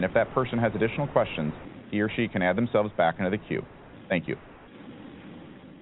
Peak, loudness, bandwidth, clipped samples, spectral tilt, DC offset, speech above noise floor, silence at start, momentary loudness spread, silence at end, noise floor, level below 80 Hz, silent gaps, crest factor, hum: -8 dBFS; -27 LUFS; 4.1 kHz; under 0.1%; -5.5 dB/octave; under 0.1%; 19 dB; 0 s; 21 LU; 0 s; -46 dBFS; -54 dBFS; none; 22 dB; none